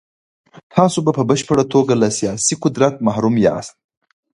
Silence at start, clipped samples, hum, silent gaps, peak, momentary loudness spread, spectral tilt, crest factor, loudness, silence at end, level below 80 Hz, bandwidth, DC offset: 0.75 s; under 0.1%; none; none; 0 dBFS; 3 LU; -5 dB/octave; 16 dB; -16 LUFS; 0.65 s; -52 dBFS; 11.5 kHz; under 0.1%